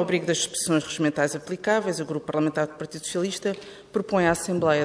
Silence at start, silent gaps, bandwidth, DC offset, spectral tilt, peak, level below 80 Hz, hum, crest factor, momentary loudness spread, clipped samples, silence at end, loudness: 0 s; none; 11 kHz; under 0.1%; -4 dB/octave; -8 dBFS; -58 dBFS; none; 18 dB; 8 LU; under 0.1%; 0 s; -25 LUFS